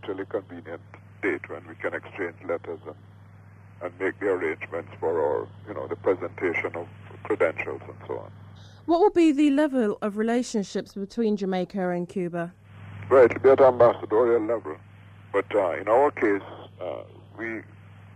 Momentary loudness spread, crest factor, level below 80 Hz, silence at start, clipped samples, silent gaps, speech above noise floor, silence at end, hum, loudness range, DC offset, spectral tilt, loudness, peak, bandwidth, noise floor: 20 LU; 18 dB; -64 dBFS; 0.05 s; under 0.1%; none; 24 dB; 0.1 s; none; 10 LU; under 0.1%; -6.5 dB/octave; -25 LUFS; -8 dBFS; 11.5 kHz; -49 dBFS